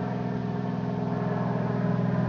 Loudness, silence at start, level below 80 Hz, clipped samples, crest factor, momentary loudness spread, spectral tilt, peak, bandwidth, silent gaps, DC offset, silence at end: -29 LUFS; 0 s; -56 dBFS; under 0.1%; 14 dB; 4 LU; -9.5 dB/octave; -14 dBFS; 6.4 kHz; none; under 0.1%; 0 s